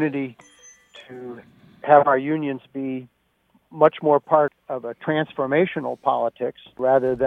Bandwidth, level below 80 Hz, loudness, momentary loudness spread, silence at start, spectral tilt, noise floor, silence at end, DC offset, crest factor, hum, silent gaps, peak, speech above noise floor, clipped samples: 6.8 kHz; -64 dBFS; -21 LUFS; 18 LU; 0 s; -7.5 dB/octave; -63 dBFS; 0 s; under 0.1%; 22 dB; none; none; -2 dBFS; 42 dB; under 0.1%